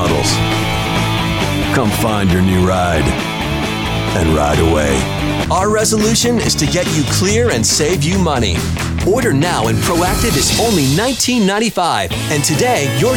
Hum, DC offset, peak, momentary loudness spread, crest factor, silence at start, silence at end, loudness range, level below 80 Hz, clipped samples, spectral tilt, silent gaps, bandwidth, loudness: none; under 0.1%; -2 dBFS; 4 LU; 12 dB; 0 s; 0 s; 1 LU; -28 dBFS; under 0.1%; -4.5 dB/octave; none; 17.5 kHz; -14 LUFS